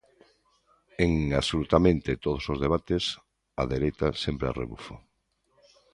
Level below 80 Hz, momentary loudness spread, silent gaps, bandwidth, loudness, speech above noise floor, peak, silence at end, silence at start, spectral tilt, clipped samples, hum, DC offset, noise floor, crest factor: -42 dBFS; 19 LU; none; 11.5 kHz; -27 LUFS; 47 dB; -4 dBFS; 0.95 s; 1 s; -6 dB/octave; under 0.1%; none; under 0.1%; -73 dBFS; 24 dB